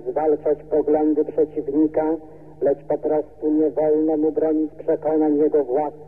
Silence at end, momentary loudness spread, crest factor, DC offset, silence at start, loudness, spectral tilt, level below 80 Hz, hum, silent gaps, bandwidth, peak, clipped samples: 0.05 s; 5 LU; 12 dB; 0.5%; 0 s; -21 LUFS; -11 dB/octave; -56 dBFS; none; none; 2.6 kHz; -8 dBFS; under 0.1%